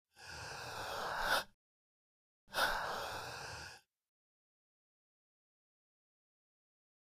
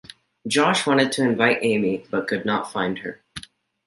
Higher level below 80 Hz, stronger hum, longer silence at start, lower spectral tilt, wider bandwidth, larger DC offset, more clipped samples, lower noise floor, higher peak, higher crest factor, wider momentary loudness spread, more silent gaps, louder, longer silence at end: about the same, -62 dBFS vs -62 dBFS; neither; second, 0.15 s vs 0.45 s; second, -1.5 dB/octave vs -4.5 dB/octave; first, 15.5 kHz vs 11.5 kHz; neither; neither; first, under -90 dBFS vs -42 dBFS; second, -22 dBFS vs -2 dBFS; about the same, 24 dB vs 20 dB; about the same, 16 LU vs 18 LU; first, 1.54-2.47 s vs none; second, -40 LUFS vs -21 LUFS; first, 3.25 s vs 0.45 s